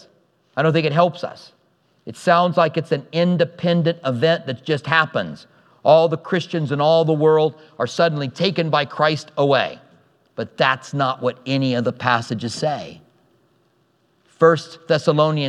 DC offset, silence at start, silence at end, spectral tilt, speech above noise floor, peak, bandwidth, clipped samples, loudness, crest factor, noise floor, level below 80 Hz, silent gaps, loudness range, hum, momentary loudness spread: under 0.1%; 0.55 s; 0 s; -6 dB/octave; 44 dB; 0 dBFS; 10.5 kHz; under 0.1%; -19 LUFS; 20 dB; -62 dBFS; -70 dBFS; none; 4 LU; none; 11 LU